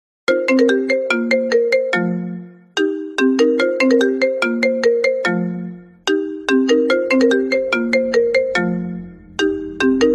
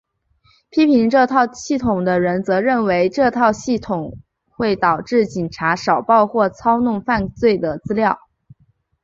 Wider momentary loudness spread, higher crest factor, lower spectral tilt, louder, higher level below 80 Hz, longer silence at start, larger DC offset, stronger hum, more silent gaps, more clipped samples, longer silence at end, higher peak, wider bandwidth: about the same, 10 LU vs 8 LU; about the same, 16 dB vs 16 dB; about the same, -5 dB/octave vs -6 dB/octave; about the same, -17 LUFS vs -17 LUFS; second, -54 dBFS vs -48 dBFS; second, 0.3 s vs 0.75 s; neither; neither; neither; neither; second, 0 s vs 0.85 s; about the same, 0 dBFS vs -2 dBFS; first, 11 kHz vs 7.8 kHz